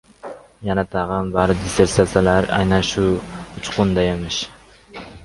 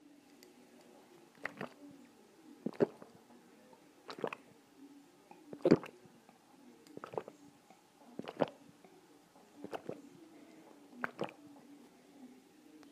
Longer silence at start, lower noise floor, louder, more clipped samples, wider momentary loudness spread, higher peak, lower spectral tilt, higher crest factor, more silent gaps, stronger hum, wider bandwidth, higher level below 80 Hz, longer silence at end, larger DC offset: second, 0.25 s vs 1.45 s; second, -39 dBFS vs -64 dBFS; first, -19 LUFS vs -40 LUFS; neither; second, 21 LU vs 25 LU; first, 0 dBFS vs -10 dBFS; second, -5.5 dB/octave vs -7 dB/octave; second, 20 dB vs 34 dB; neither; neither; second, 11.5 kHz vs 15.5 kHz; first, -36 dBFS vs -80 dBFS; about the same, 0 s vs 0 s; neither